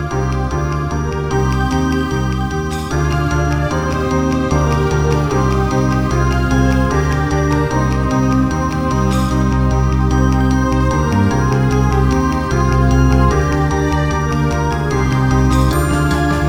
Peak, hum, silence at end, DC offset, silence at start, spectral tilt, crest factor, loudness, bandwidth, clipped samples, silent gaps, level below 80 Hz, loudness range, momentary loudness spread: -2 dBFS; none; 0 s; under 0.1%; 0 s; -6.5 dB/octave; 14 dB; -15 LUFS; over 20 kHz; under 0.1%; none; -20 dBFS; 3 LU; 5 LU